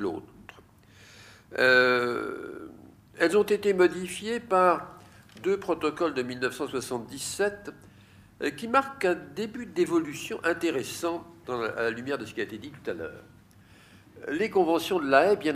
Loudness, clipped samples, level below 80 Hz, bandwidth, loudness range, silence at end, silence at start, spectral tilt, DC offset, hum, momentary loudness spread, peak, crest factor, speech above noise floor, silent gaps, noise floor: -27 LUFS; under 0.1%; -64 dBFS; 15.5 kHz; 6 LU; 0 s; 0 s; -4 dB/octave; under 0.1%; none; 16 LU; -6 dBFS; 22 dB; 28 dB; none; -55 dBFS